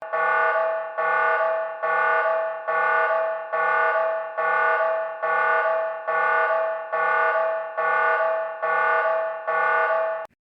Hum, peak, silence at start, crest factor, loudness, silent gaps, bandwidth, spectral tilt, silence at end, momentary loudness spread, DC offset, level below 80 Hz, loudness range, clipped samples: none; -10 dBFS; 0 s; 12 dB; -22 LUFS; none; 5.4 kHz; -4 dB/octave; 0.2 s; 5 LU; under 0.1%; under -90 dBFS; 1 LU; under 0.1%